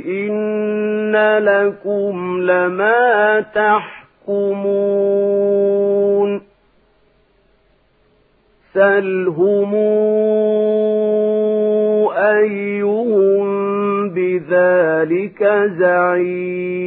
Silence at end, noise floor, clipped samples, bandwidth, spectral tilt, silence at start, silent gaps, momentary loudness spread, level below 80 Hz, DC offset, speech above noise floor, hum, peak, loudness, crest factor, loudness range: 0 s; -57 dBFS; under 0.1%; 4 kHz; -11.5 dB/octave; 0 s; none; 6 LU; -66 dBFS; under 0.1%; 42 dB; none; -2 dBFS; -16 LUFS; 14 dB; 4 LU